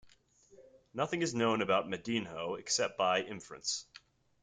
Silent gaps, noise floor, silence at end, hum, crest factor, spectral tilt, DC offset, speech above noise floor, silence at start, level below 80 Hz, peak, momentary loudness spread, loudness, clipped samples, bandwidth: none; -64 dBFS; 0.45 s; none; 20 dB; -3 dB/octave; under 0.1%; 30 dB; 0.05 s; -74 dBFS; -16 dBFS; 9 LU; -34 LUFS; under 0.1%; 9.6 kHz